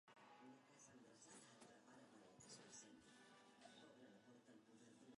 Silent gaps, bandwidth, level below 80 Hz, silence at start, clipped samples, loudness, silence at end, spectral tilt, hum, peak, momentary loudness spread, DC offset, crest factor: none; 11 kHz; under -90 dBFS; 0.05 s; under 0.1%; -66 LUFS; 0 s; -3 dB/octave; none; -48 dBFS; 7 LU; under 0.1%; 18 dB